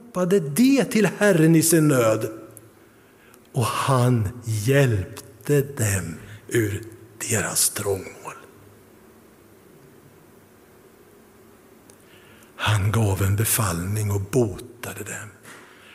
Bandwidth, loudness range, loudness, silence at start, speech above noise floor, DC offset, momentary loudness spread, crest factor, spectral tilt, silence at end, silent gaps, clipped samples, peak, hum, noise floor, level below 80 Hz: 16 kHz; 8 LU; -21 LUFS; 0.05 s; 31 dB; under 0.1%; 18 LU; 18 dB; -5 dB/octave; 0.35 s; none; under 0.1%; -4 dBFS; none; -52 dBFS; -54 dBFS